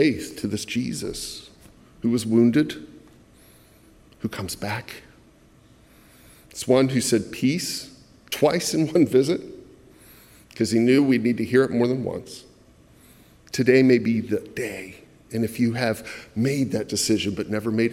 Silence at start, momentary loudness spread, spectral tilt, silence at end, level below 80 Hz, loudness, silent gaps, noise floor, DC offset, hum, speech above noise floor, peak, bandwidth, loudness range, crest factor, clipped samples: 0 s; 16 LU; -5 dB/octave; 0 s; -58 dBFS; -23 LUFS; none; -54 dBFS; under 0.1%; none; 32 dB; -4 dBFS; 16 kHz; 6 LU; 20 dB; under 0.1%